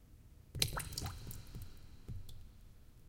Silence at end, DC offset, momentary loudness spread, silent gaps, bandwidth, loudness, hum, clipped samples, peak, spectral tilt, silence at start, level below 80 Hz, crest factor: 0 s; under 0.1%; 25 LU; none; 17 kHz; -43 LUFS; none; under 0.1%; -12 dBFS; -2.5 dB/octave; 0 s; -52 dBFS; 34 dB